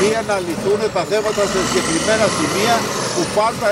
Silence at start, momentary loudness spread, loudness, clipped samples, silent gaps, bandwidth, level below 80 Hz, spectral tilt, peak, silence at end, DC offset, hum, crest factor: 0 s; 4 LU; -17 LUFS; under 0.1%; none; 16 kHz; -46 dBFS; -3.5 dB/octave; -4 dBFS; 0 s; under 0.1%; none; 14 dB